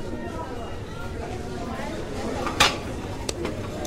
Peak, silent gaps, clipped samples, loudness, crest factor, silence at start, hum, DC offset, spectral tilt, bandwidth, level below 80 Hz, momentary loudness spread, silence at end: -2 dBFS; none; under 0.1%; -28 LUFS; 26 dB; 0 s; none; under 0.1%; -3.5 dB/octave; 16 kHz; -38 dBFS; 14 LU; 0 s